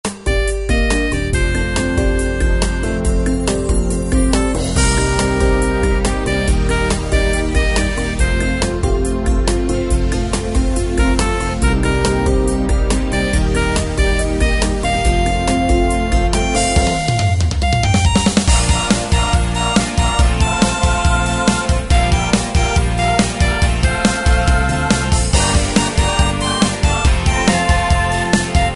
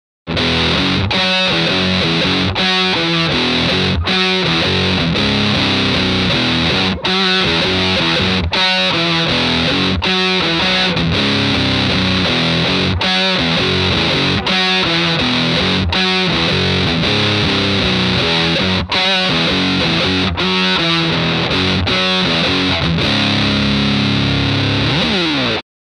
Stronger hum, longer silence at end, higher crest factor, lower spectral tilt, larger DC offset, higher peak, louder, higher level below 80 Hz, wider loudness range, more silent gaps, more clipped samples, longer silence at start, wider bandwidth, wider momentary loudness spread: neither; second, 0 s vs 0.35 s; about the same, 14 dB vs 14 dB; about the same, -4.5 dB/octave vs -5 dB/octave; neither; about the same, 0 dBFS vs 0 dBFS; second, -16 LUFS vs -13 LUFS; first, -18 dBFS vs -34 dBFS; about the same, 2 LU vs 1 LU; neither; neither; second, 0.05 s vs 0.25 s; about the same, 11.5 kHz vs 11 kHz; about the same, 3 LU vs 2 LU